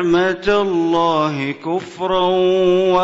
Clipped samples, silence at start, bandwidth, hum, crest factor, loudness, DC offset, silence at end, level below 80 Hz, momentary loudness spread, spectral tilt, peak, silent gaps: under 0.1%; 0 s; 7.8 kHz; none; 12 dB; -17 LUFS; under 0.1%; 0 s; -46 dBFS; 8 LU; -6 dB/octave; -4 dBFS; none